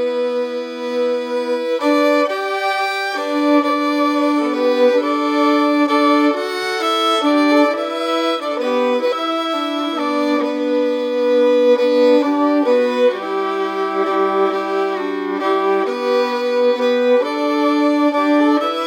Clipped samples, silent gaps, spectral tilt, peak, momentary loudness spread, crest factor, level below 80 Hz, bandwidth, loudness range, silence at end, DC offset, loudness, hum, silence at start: under 0.1%; none; -3.5 dB/octave; -2 dBFS; 6 LU; 14 dB; -88 dBFS; 16.5 kHz; 3 LU; 0 s; under 0.1%; -17 LUFS; none; 0 s